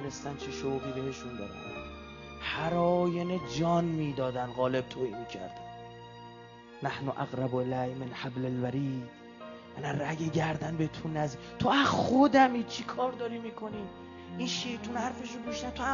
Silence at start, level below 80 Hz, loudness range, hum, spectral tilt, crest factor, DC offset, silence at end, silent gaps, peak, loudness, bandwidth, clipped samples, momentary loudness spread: 0 s; -58 dBFS; 8 LU; none; -6 dB/octave; 20 dB; under 0.1%; 0 s; none; -12 dBFS; -32 LUFS; 7.4 kHz; under 0.1%; 19 LU